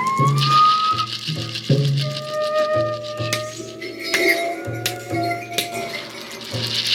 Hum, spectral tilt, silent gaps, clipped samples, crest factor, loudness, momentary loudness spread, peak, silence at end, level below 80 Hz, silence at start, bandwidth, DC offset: none; -4.5 dB/octave; none; under 0.1%; 16 dB; -20 LUFS; 13 LU; -4 dBFS; 0 s; -58 dBFS; 0 s; 18 kHz; under 0.1%